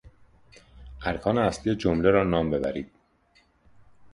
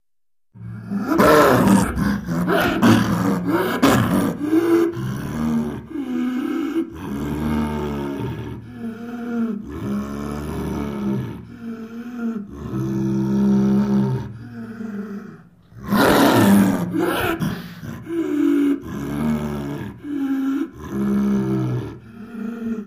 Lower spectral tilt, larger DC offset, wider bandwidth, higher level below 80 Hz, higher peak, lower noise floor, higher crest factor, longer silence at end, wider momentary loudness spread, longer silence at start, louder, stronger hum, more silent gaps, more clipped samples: about the same, -7 dB/octave vs -6.5 dB/octave; neither; second, 11 kHz vs 15.5 kHz; about the same, -46 dBFS vs -42 dBFS; second, -6 dBFS vs 0 dBFS; second, -64 dBFS vs -80 dBFS; about the same, 22 dB vs 20 dB; about the same, 0.05 s vs 0 s; second, 12 LU vs 17 LU; second, 0.05 s vs 0.55 s; second, -25 LUFS vs -20 LUFS; neither; neither; neither